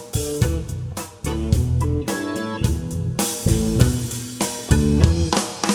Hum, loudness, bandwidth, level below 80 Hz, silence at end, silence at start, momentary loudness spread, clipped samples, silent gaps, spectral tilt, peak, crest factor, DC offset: none; -21 LUFS; 19 kHz; -28 dBFS; 0 s; 0 s; 10 LU; under 0.1%; none; -5 dB/octave; 0 dBFS; 20 dB; under 0.1%